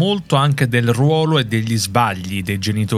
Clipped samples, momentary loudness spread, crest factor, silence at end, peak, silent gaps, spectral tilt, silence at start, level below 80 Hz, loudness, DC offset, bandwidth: under 0.1%; 5 LU; 16 dB; 0 s; 0 dBFS; none; -5.5 dB/octave; 0 s; -50 dBFS; -17 LUFS; under 0.1%; 15.5 kHz